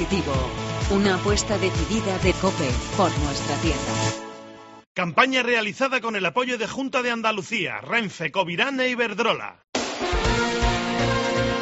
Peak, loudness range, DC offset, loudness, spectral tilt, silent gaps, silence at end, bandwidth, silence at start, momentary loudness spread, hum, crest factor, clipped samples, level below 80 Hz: -2 dBFS; 1 LU; under 0.1%; -23 LUFS; -3.5 dB/octave; 4.86-4.95 s, 9.69-9.73 s; 0 s; 8 kHz; 0 s; 7 LU; none; 20 dB; under 0.1%; -36 dBFS